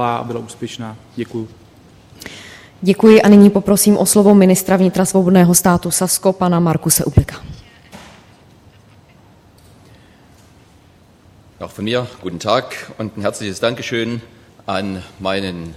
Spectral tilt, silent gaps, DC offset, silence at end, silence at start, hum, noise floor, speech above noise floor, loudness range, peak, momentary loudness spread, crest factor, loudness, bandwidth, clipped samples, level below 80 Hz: -5 dB/octave; none; under 0.1%; 0 s; 0 s; none; -48 dBFS; 34 dB; 13 LU; 0 dBFS; 21 LU; 16 dB; -14 LUFS; 15.5 kHz; under 0.1%; -40 dBFS